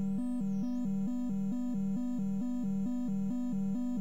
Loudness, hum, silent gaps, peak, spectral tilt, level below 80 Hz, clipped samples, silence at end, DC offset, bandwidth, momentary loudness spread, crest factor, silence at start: -35 LUFS; none; none; -26 dBFS; -9 dB/octave; -60 dBFS; under 0.1%; 0 s; 0.9%; 8.6 kHz; 0 LU; 6 dB; 0 s